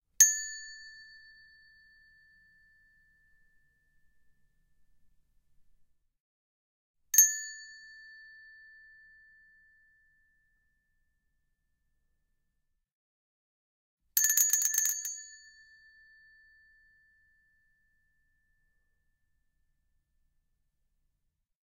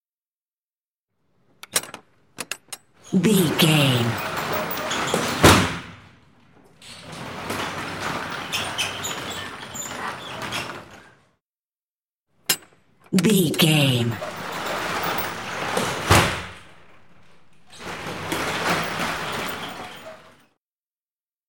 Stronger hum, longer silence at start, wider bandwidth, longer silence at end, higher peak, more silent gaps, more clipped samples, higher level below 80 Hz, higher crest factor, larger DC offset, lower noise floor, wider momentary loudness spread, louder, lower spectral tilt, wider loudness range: neither; second, 0.2 s vs 1.7 s; about the same, 16 kHz vs 17 kHz; first, 6.35 s vs 1.25 s; about the same, -2 dBFS vs -2 dBFS; first, 6.20-6.94 s, 12.93-13.97 s vs 11.45-12.09 s, 12.15-12.19 s; neither; second, -76 dBFS vs -50 dBFS; first, 34 dB vs 24 dB; neither; second, -80 dBFS vs under -90 dBFS; first, 28 LU vs 19 LU; about the same, -25 LUFS vs -23 LUFS; second, 6 dB/octave vs -4 dB/octave; first, 14 LU vs 10 LU